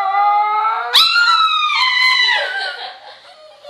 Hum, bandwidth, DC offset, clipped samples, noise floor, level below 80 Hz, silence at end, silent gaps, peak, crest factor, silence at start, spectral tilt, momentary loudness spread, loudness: none; 16 kHz; under 0.1%; under 0.1%; -42 dBFS; -72 dBFS; 0 s; none; 0 dBFS; 16 dB; 0 s; 3 dB/octave; 12 LU; -12 LUFS